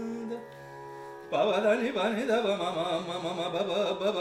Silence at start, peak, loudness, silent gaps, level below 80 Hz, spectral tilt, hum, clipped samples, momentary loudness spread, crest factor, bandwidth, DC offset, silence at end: 0 s; -14 dBFS; -29 LUFS; none; -70 dBFS; -5 dB/octave; none; under 0.1%; 17 LU; 16 dB; 14 kHz; under 0.1%; 0 s